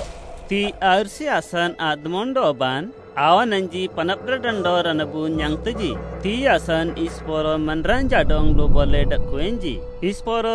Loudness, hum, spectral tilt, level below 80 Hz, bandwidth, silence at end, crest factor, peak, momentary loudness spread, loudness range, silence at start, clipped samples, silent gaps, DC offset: -21 LUFS; none; -5.5 dB/octave; -26 dBFS; 11 kHz; 0 s; 18 dB; -2 dBFS; 8 LU; 2 LU; 0 s; under 0.1%; none; under 0.1%